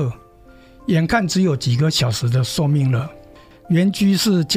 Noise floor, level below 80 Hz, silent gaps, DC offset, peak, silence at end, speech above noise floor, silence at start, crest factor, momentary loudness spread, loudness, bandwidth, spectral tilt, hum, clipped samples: -46 dBFS; -46 dBFS; none; under 0.1%; -4 dBFS; 0 s; 29 dB; 0 s; 14 dB; 6 LU; -18 LUFS; 16 kHz; -5.5 dB/octave; none; under 0.1%